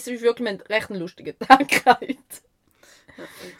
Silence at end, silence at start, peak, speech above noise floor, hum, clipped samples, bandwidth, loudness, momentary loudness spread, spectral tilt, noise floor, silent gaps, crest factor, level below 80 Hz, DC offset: 0.1 s; 0 s; 0 dBFS; 34 dB; none; under 0.1%; 16.5 kHz; -19 LUFS; 19 LU; -3.5 dB/octave; -56 dBFS; none; 22 dB; -60 dBFS; under 0.1%